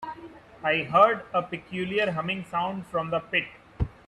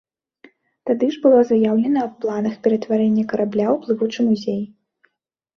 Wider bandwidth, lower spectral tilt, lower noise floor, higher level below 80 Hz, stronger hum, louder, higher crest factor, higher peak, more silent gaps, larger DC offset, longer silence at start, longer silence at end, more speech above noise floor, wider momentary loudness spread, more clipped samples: first, 12 kHz vs 6.6 kHz; about the same, -6.5 dB/octave vs -7.5 dB/octave; second, -47 dBFS vs -74 dBFS; first, -48 dBFS vs -64 dBFS; neither; second, -26 LUFS vs -19 LUFS; first, 22 dB vs 16 dB; about the same, -6 dBFS vs -4 dBFS; neither; neither; second, 0 s vs 0.85 s; second, 0.15 s vs 0.9 s; second, 20 dB vs 56 dB; first, 14 LU vs 9 LU; neither